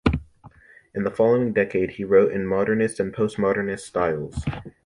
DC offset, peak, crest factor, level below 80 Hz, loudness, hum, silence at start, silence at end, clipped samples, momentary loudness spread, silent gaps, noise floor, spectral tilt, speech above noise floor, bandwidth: under 0.1%; -4 dBFS; 20 dB; -40 dBFS; -23 LUFS; none; 0.05 s; 0.15 s; under 0.1%; 11 LU; none; -50 dBFS; -7 dB/octave; 28 dB; 11.5 kHz